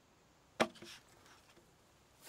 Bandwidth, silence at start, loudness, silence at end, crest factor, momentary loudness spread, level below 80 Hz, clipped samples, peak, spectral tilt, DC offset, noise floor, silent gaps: 16 kHz; 0.6 s; -40 LUFS; 0 s; 32 dB; 24 LU; -78 dBFS; under 0.1%; -14 dBFS; -3.5 dB/octave; under 0.1%; -68 dBFS; none